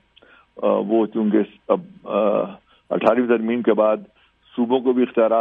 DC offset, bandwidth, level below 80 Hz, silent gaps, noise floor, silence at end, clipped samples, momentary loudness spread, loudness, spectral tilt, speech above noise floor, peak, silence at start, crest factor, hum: under 0.1%; 4.3 kHz; -66 dBFS; none; -53 dBFS; 0 s; under 0.1%; 8 LU; -20 LUFS; -9 dB/octave; 34 dB; -2 dBFS; 0.55 s; 18 dB; none